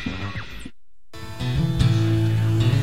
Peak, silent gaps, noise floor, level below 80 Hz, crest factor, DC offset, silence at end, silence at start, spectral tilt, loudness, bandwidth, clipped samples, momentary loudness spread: -8 dBFS; none; -48 dBFS; -36 dBFS; 16 dB; 2%; 0 s; 0 s; -7 dB/octave; -22 LUFS; 13 kHz; under 0.1%; 20 LU